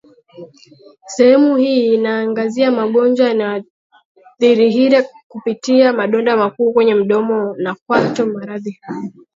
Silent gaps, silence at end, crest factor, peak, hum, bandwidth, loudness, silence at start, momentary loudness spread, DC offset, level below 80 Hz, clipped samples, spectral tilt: 3.70-3.90 s, 4.05-4.15 s, 5.23-5.30 s, 7.82-7.86 s; 0.25 s; 14 dB; 0 dBFS; none; 7.6 kHz; -14 LUFS; 0.35 s; 15 LU; under 0.1%; -64 dBFS; under 0.1%; -5.5 dB/octave